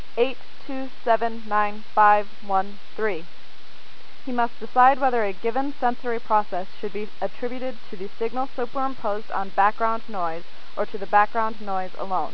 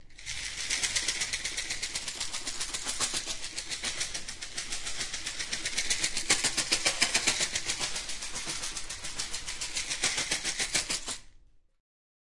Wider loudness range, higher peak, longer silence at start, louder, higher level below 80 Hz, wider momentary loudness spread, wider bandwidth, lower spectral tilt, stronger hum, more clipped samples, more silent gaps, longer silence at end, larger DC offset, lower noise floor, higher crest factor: about the same, 4 LU vs 5 LU; first, -4 dBFS vs -8 dBFS; first, 0.15 s vs 0 s; first, -24 LUFS vs -30 LUFS; second, -66 dBFS vs -50 dBFS; first, 15 LU vs 10 LU; second, 5.4 kHz vs 11.5 kHz; first, -6.5 dB/octave vs 0.5 dB/octave; neither; neither; neither; second, 0 s vs 0.65 s; first, 7% vs under 0.1%; second, -49 dBFS vs -57 dBFS; about the same, 20 dB vs 24 dB